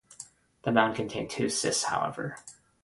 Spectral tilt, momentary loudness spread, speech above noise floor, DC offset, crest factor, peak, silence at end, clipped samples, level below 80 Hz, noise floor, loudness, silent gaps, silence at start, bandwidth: -3.5 dB/octave; 21 LU; 22 dB; under 0.1%; 24 dB; -8 dBFS; 0.3 s; under 0.1%; -64 dBFS; -51 dBFS; -29 LUFS; none; 0.1 s; 11.5 kHz